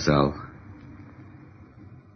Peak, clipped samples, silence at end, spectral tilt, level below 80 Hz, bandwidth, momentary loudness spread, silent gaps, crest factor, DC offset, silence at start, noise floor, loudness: -6 dBFS; under 0.1%; 0.2 s; -6 dB/octave; -46 dBFS; 6.6 kHz; 26 LU; none; 22 dB; under 0.1%; 0 s; -48 dBFS; -25 LUFS